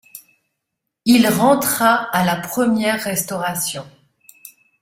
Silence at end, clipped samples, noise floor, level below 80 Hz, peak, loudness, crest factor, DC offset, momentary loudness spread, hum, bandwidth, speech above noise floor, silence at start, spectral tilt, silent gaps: 0.35 s; under 0.1%; -79 dBFS; -58 dBFS; -2 dBFS; -17 LUFS; 18 dB; under 0.1%; 9 LU; none; 16.5 kHz; 62 dB; 0.15 s; -4 dB/octave; none